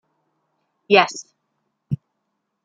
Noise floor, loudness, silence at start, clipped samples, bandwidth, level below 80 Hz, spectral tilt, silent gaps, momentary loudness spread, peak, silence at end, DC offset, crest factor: -76 dBFS; -20 LUFS; 0.9 s; under 0.1%; 9.2 kHz; -64 dBFS; -4 dB/octave; none; 15 LU; -2 dBFS; 0.7 s; under 0.1%; 22 dB